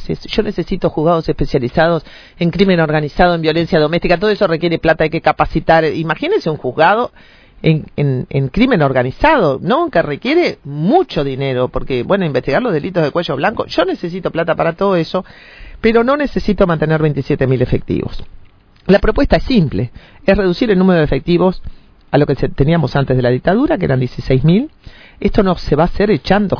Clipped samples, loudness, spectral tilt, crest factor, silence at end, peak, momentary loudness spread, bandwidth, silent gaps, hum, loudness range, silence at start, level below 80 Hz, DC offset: under 0.1%; -14 LUFS; -8.5 dB/octave; 14 dB; 0 s; 0 dBFS; 6 LU; 5.4 kHz; none; none; 2 LU; 0 s; -30 dBFS; under 0.1%